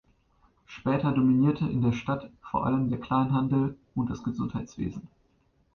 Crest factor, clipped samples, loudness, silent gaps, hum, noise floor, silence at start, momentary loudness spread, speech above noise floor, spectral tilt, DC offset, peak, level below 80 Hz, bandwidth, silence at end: 16 dB; under 0.1%; -28 LUFS; none; none; -67 dBFS; 0.7 s; 11 LU; 41 dB; -8.5 dB/octave; under 0.1%; -12 dBFS; -54 dBFS; 6.6 kHz; 0.7 s